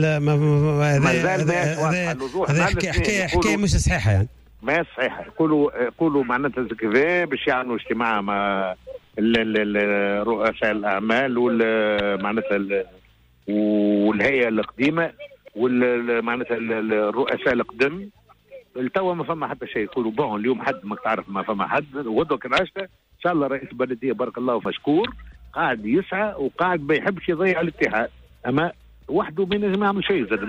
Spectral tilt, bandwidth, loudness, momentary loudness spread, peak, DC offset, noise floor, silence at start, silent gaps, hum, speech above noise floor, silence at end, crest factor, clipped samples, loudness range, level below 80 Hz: -6 dB/octave; 12.5 kHz; -22 LUFS; 8 LU; -8 dBFS; under 0.1%; -55 dBFS; 0 s; none; none; 34 dB; 0 s; 14 dB; under 0.1%; 4 LU; -40 dBFS